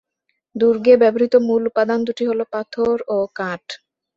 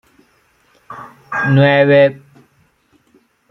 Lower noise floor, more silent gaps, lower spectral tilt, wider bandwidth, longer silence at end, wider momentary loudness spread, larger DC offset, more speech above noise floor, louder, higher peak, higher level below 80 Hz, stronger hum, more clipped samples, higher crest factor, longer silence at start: first, -73 dBFS vs -57 dBFS; neither; second, -6.5 dB/octave vs -8.5 dB/octave; first, 7.4 kHz vs 6.2 kHz; second, 0.4 s vs 1.35 s; second, 15 LU vs 25 LU; neither; first, 56 dB vs 45 dB; second, -18 LUFS vs -12 LUFS; about the same, -2 dBFS vs -2 dBFS; about the same, -60 dBFS vs -58 dBFS; neither; neither; about the same, 16 dB vs 16 dB; second, 0.55 s vs 0.9 s